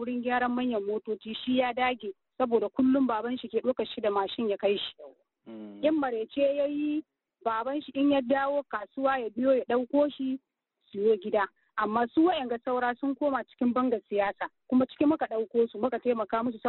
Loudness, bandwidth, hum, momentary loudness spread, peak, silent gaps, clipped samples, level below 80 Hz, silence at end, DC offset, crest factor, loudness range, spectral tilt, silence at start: -29 LUFS; 4.2 kHz; none; 8 LU; -14 dBFS; none; under 0.1%; -68 dBFS; 0 s; under 0.1%; 16 dB; 2 LU; -3 dB/octave; 0 s